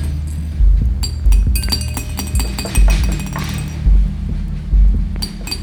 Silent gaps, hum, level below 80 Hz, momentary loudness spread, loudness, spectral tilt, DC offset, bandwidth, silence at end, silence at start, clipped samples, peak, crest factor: none; none; -16 dBFS; 7 LU; -18 LUFS; -4.5 dB/octave; under 0.1%; 18.5 kHz; 0 s; 0 s; under 0.1%; -2 dBFS; 12 dB